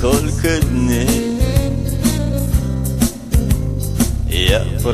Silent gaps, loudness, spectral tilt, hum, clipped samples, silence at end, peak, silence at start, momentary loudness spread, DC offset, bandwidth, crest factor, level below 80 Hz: none; -17 LUFS; -5.5 dB/octave; none; under 0.1%; 0 s; -2 dBFS; 0 s; 4 LU; under 0.1%; 15 kHz; 14 dB; -20 dBFS